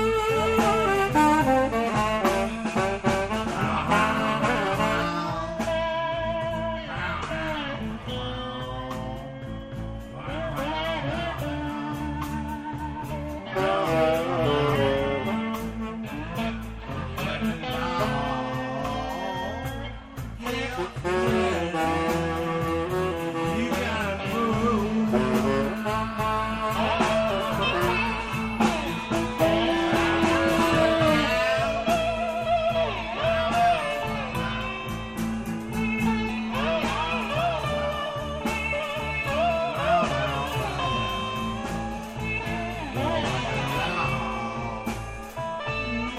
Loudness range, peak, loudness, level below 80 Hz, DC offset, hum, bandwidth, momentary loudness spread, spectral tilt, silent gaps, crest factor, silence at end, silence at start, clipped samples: 7 LU; -8 dBFS; -26 LUFS; -42 dBFS; under 0.1%; none; 15.5 kHz; 11 LU; -5.5 dB/octave; none; 18 dB; 0 s; 0 s; under 0.1%